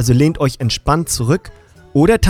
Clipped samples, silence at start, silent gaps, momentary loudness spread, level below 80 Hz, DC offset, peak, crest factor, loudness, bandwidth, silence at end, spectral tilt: under 0.1%; 0 s; none; 6 LU; -28 dBFS; under 0.1%; 0 dBFS; 14 dB; -16 LUFS; 16.5 kHz; 0 s; -5.5 dB/octave